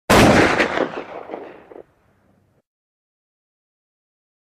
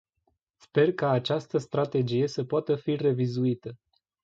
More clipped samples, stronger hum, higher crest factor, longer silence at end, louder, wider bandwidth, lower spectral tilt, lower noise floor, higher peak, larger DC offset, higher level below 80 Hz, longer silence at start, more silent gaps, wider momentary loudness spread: neither; neither; about the same, 18 dB vs 16 dB; first, 2.7 s vs 0.5 s; first, -15 LUFS vs -27 LUFS; first, 15 kHz vs 7.8 kHz; second, -4.5 dB/octave vs -7.5 dB/octave; second, -60 dBFS vs -75 dBFS; first, -2 dBFS vs -10 dBFS; neither; first, -40 dBFS vs -70 dBFS; second, 0.1 s vs 0.75 s; neither; first, 23 LU vs 5 LU